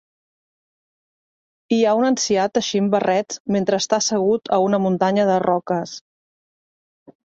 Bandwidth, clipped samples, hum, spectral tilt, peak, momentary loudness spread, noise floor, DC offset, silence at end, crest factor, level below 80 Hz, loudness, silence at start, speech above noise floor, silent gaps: 8.2 kHz; under 0.1%; none; -4.5 dB/octave; -4 dBFS; 6 LU; under -90 dBFS; under 0.1%; 1.3 s; 16 dB; -64 dBFS; -19 LUFS; 1.7 s; over 71 dB; 3.40-3.45 s